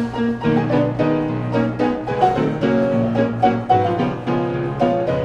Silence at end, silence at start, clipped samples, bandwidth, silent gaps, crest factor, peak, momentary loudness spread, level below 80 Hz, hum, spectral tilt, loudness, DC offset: 0 s; 0 s; under 0.1%; 8.4 kHz; none; 16 dB; -2 dBFS; 4 LU; -44 dBFS; none; -8.5 dB/octave; -19 LUFS; under 0.1%